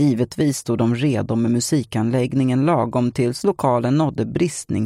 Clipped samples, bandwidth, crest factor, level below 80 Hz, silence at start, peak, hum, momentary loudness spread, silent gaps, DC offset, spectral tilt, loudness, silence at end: under 0.1%; 15 kHz; 14 dB; -52 dBFS; 0 s; -4 dBFS; none; 3 LU; none; under 0.1%; -6.5 dB/octave; -20 LUFS; 0 s